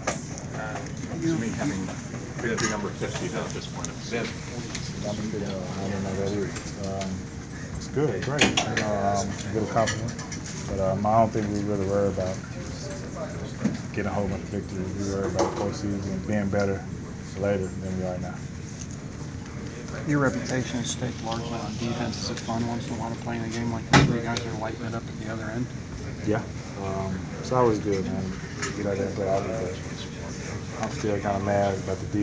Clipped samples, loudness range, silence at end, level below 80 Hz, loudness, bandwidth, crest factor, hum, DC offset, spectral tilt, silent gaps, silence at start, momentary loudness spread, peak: under 0.1%; 5 LU; 0 s; -44 dBFS; -28 LUFS; 8 kHz; 24 dB; none; under 0.1%; -5 dB/octave; none; 0 s; 10 LU; -4 dBFS